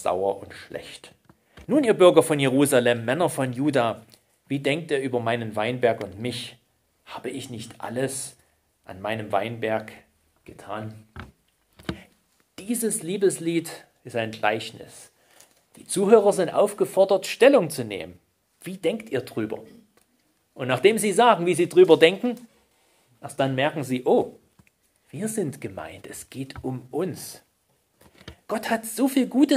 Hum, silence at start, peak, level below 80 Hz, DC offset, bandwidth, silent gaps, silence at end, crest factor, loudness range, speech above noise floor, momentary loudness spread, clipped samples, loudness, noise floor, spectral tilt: none; 0 s; 0 dBFS; -62 dBFS; under 0.1%; 16 kHz; none; 0 s; 24 dB; 12 LU; 45 dB; 21 LU; under 0.1%; -23 LUFS; -68 dBFS; -5 dB/octave